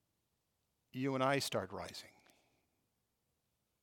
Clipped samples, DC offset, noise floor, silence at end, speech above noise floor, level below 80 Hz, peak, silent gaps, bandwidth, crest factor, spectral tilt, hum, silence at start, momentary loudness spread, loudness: under 0.1%; under 0.1%; -84 dBFS; 1.75 s; 46 dB; -84 dBFS; -20 dBFS; none; 18 kHz; 24 dB; -4.5 dB/octave; none; 0.95 s; 16 LU; -38 LUFS